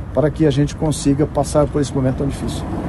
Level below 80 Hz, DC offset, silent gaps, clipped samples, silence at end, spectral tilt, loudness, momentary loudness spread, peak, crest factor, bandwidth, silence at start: -30 dBFS; under 0.1%; none; under 0.1%; 0 s; -6.5 dB/octave; -18 LUFS; 6 LU; -2 dBFS; 16 dB; 12.5 kHz; 0 s